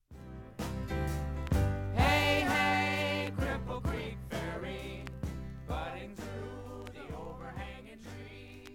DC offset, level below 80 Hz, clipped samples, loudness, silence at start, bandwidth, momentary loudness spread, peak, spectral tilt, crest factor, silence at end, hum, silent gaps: under 0.1%; -42 dBFS; under 0.1%; -34 LUFS; 0.1 s; 17 kHz; 19 LU; -14 dBFS; -5.5 dB/octave; 20 dB; 0 s; none; none